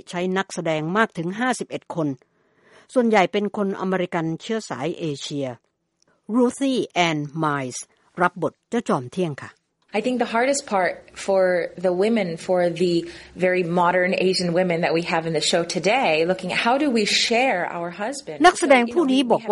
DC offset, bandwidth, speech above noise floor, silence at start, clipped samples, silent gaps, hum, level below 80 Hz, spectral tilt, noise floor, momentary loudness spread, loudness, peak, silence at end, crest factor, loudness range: under 0.1%; 11.5 kHz; 44 dB; 0.1 s; under 0.1%; none; none; -62 dBFS; -4.5 dB/octave; -66 dBFS; 10 LU; -22 LUFS; -4 dBFS; 0 s; 18 dB; 5 LU